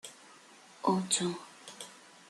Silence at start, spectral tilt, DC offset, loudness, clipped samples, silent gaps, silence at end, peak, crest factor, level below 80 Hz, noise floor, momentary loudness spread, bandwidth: 0.05 s; -3.5 dB/octave; under 0.1%; -32 LUFS; under 0.1%; none; 0.3 s; -12 dBFS; 24 dB; -78 dBFS; -57 dBFS; 25 LU; 13 kHz